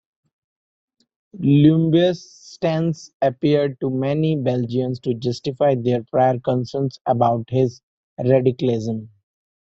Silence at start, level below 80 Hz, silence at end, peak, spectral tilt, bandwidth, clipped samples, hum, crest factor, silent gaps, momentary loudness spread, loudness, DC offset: 1.35 s; -58 dBFS; 0.6 s; -2 dBFS; -8 dB/octave; 7.6 kHz; under 0.1%; none; 18 dB; 3.14-3.20 s, 7.01-7.05 s, 7.83-8.17 s; 9 LU; -20 LUFS; under 0.1%